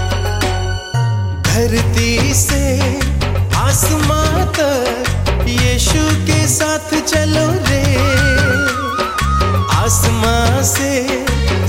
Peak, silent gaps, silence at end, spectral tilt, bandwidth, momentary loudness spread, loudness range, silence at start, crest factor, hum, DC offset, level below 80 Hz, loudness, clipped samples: 0 dBFS; none; 0 s; -4.5 dB/octave; 16.5 kHz; 4 LU; 1 LU; 0 s; 14 dB; none; under 0.1%; -22 dBFS; -14 LUFS; under 0.1%